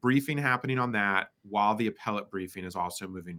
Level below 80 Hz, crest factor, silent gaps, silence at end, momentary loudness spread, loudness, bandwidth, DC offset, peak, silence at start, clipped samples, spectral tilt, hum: -72 dBFS; 20 dB; none; 0 s; 10 LU; -30 LUFS; 18.5 kHz; under 0.1%; -8 dBFS; 0.05 s; under 0.1%; -5.5 dB/octave; none